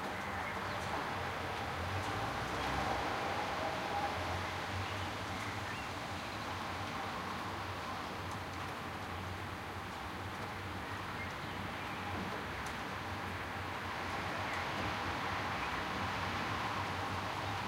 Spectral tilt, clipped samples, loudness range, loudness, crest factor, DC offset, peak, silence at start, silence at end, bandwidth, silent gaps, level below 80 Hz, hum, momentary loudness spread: -4.5 dB/octave; under 0.1%; 5 LU; -39 LUFS; 16 dB; under 0.1%; -24 dBFS; 0 s; 0 s; 16 kHz; none; -56 dBFS; none; 5 LU